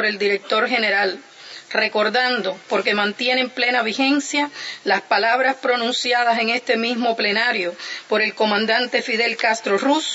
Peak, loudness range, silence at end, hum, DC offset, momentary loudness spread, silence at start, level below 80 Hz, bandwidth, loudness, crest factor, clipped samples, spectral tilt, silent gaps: -4 dBFS; 1 LU; 0 s; none; under 0.1%; 6 LU; 0 s; -80 dBFS; 8 kHz; -19 LUFS; 16 dB; under 0.1%; -2.5 dB/octave; none